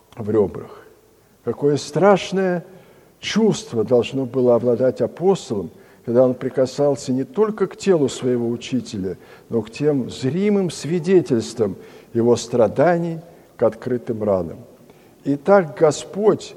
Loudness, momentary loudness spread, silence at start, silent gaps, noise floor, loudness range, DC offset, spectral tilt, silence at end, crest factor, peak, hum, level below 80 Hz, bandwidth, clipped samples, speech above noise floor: -20 LUFS; 12 LU; 0.15 s; none; -53 dBFS; 2 LU; under 0.1%; -6 dB/octave; 0 s; 20 dB; 0 dBFS; none; -58 dBFS; 12.5 kHz; under 0.1%; 34 dB